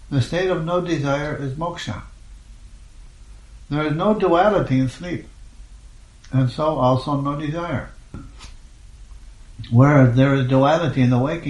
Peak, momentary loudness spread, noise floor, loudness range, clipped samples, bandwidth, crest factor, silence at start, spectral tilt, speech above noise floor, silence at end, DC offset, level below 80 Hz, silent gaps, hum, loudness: -2 dBFS; 16 LU; -43 dBFS; 7 LU; under 0.1%; 10 kHz; 20 dB; 0 s; -7.5 dB/octave; 25 dB; 0 s; under 0.1%; -42 dBFS; none; none; -19 LUFS